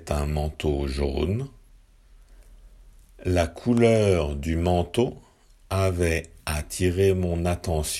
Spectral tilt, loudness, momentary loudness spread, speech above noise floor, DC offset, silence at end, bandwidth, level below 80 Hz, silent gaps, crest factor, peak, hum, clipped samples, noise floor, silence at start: -6 dB/octave; -25 LUFS; 9 LU; 30 dB; under 0.1%; 0 s; 15.5 kHz; -38 dBFS; none; 18 dB; -6 dBFS; none; under 0.1%; -53 dBFS; 0 s